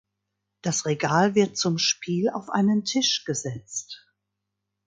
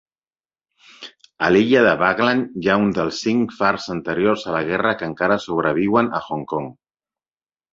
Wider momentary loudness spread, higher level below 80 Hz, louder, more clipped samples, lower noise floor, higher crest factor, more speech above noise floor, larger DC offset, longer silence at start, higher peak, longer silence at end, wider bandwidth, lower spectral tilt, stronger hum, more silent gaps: about the same, 12 LU vs 12 LU; second, -66 dBFS vs -54 dBFS; second, -24 LUFS vs -19 LUFS; neither; second, -82 dBFS vs under -90 dBFS; about the same, 18 dB vs 18 dB; second, 58 dB vs over 71 dB; neither; second, 0.65 s vs 1 s; second, -6 dBFS vs -2 dBFS; about the same, 0.9 s vs 1 s; first, 9.4 kHz vs 7.8 kHz; second, -4 dB/octave vs -6 dB/octave; neither; neither